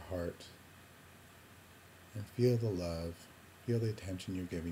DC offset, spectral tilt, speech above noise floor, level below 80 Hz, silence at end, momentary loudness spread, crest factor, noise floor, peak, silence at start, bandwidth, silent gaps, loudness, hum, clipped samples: under 0.1%; -7 dB/octave; 22 dB; -60 dBFS; 0 s; 24 LU; 20 dB; -58 dBFS; -18 dBFS; 0 s; 16 kHz; none; -38 LUFS; none; under 0.1%